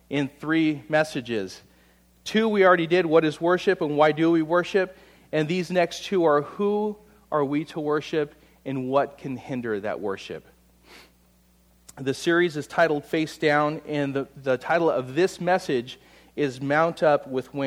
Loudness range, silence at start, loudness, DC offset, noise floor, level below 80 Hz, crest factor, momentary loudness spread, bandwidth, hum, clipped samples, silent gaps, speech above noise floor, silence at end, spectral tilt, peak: 8 LU; 0.1 s; -24 LUFS; under 0.1%; -60 dBFS; -62 dBFS; 20 dB; 11 LU; 15 kHz; none; under 0.1%; none; 36 dB; 0 s; -6 dB/octave; -4 dBFS